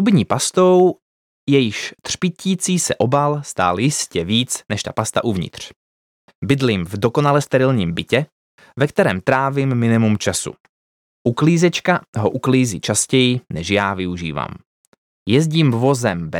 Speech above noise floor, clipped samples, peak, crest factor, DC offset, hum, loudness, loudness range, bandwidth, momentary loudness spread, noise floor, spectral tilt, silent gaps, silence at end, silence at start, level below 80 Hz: over 73 dB; under 0.1%; -2 dBFS; 16 dB; under 0.1%; none; -18 LUFS; 3 LU; 17 kHz; 10 LU; under -90 dBFS; -5 dB/octave; 1.02-1.47 s, 5.76-6.28 s, 6.35-6.42 s, 8.32-8.58 s, 10.60-11.25 s, 12.08-12.13 s, 14.66-15.26 s; 0 s; 0 s; -50 dBFS